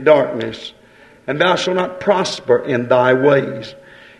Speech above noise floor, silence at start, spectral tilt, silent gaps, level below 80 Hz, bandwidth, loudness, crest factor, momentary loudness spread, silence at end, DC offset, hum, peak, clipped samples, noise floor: 31 dB; 0 s; -5 dB/octave; none; -58 dBFS; 11 kHz; -16 LUFS; 16 dB; 18 LU; 0.45 s; under 0.1%; none; 0 dBFS; under 0.1%; -46 dBFS